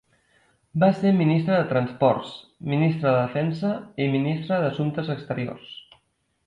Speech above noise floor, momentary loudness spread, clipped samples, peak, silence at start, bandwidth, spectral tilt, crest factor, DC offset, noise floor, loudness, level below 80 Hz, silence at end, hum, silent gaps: 46 dB; 13 LU; under 0.1%; -8 dBFS; 0.75 s; 7.6 kHz; -9 dB/octave; 16 dB; under 0.1%; -69 dBFS; -23 LUFS; -62 dBFS; 0.7 s; none; none